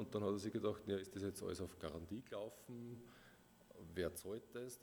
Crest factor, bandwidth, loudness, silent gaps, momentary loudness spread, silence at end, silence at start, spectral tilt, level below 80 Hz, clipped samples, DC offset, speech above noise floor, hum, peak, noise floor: 18 dB; over 20 kHz; -47 LUFS; none; 18 LU; 0 s; 0 s; -5.5 dB/octave; -70 dBFS; under 0.1%; under 0.1%; 21 dB; none; -28 dBFS; -67 dBFS